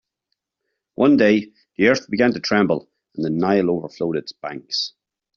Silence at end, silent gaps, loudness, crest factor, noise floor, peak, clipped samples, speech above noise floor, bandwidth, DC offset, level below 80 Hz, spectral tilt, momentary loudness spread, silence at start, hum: 0.45 s; none; -20 LUFS; 18 dB; -78 dBFS; -2 dBFS; under 0.1%; 60 dB; 7.2 kHz; under 0.1%; -60 dBFS; -4 dB/octave; 15 LU; 1 s; none